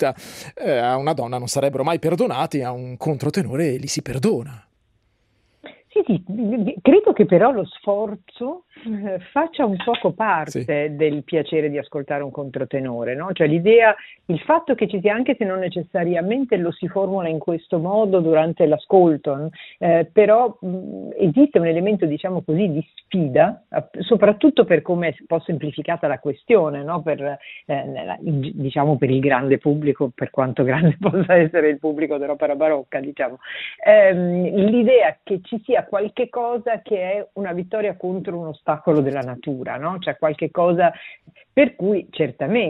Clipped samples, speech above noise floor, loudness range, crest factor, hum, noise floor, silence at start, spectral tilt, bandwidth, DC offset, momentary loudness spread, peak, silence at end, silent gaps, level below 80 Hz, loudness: under 0.1%; 45 dB; 6 LU; 18 dB; none; -64 dBFS; 0 s; -7 dB/octave; 13.5 kHz; under 0.1%; 12 LU; 0 dBFS; 0 s; none; -60 dBFS; -20 LUFS